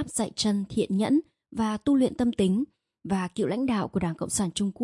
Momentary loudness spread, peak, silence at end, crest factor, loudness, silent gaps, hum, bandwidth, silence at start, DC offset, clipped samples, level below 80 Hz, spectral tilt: 6 LU; -12 dBFS; 0 s; 14 dB; -27 LUFS; none; none; 11.5 kHz; 0 s; under 0.1%; under 0.1%; -56 dBFS; -5 dB/octave